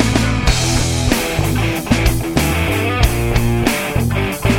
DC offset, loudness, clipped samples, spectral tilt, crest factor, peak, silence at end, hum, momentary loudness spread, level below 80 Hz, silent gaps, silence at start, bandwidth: under 0.1%; -16 LUFS; under 0.1%; -5 dB/octave; 16 dB; 0 dBFS; 0 s; none; 2 LU; -22 dBFS; none; 0 s; 17 kHz